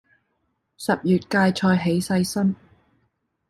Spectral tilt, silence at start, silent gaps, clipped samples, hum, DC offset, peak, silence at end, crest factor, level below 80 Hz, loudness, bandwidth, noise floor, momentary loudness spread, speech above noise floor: -6 dB/octave; 0.8 s; none; under 0.1%; none; under 0.1%; -8 dBFS; 0.95 s; 16 dB; -58 dBFS; -22 LUFS; 13 kHz; -73 dBFS; 6 LU; 52 dB